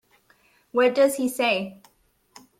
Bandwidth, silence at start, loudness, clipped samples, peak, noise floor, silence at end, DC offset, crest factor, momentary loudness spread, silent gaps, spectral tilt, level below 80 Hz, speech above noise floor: 16 kHz; 0.75 s; -22 LUFS; under 0.1%; -8 dBFS; -64 dBFS; 0.85 s; under 0.1%; 18 dB; 9 LU; none; -3.5 dB/octave; -70 dBFS; 42 dB